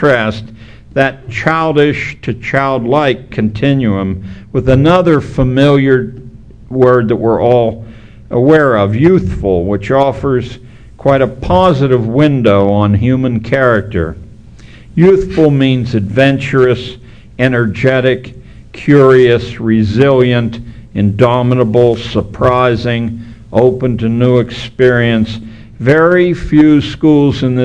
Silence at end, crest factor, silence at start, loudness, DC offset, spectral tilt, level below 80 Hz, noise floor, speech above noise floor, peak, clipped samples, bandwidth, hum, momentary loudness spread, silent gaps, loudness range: 0 s; 10 dB; 0 s; -11 LUFS; 0.7%; -8 dB/octave; -32 dBFS; -35 dBFS; 25 dB; 0 dBFS; 0.7%; 9.4 kHz; none; 10 LU; none; 2 LU